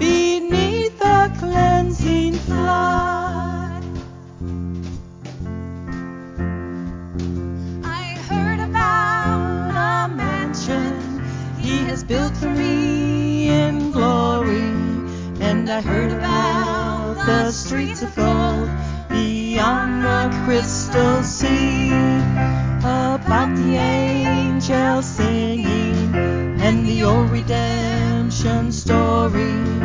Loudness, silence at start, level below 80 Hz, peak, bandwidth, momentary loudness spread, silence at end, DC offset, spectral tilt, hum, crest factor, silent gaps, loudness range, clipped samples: -19 LUFS; 0 s; -30 dBFS; -2 dBFS; 7.6 kHz; 11 LU; 0 s; under 0.1%; -6 dB/octave; none; 16 dB; none; 8 LU; under 0.1%